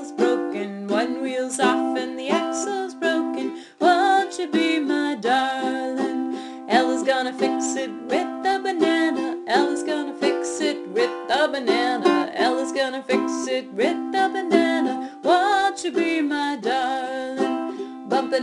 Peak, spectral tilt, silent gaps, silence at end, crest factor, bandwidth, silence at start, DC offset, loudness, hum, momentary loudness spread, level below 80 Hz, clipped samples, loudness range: -2 dBFS; -3 dB/octave; none; 0 s; 20 dB; 12 kHz; 0 s; under 0.1%; -22 LUFS; none; 7 LU; -72 dBFS; under 0.1%; 2 LU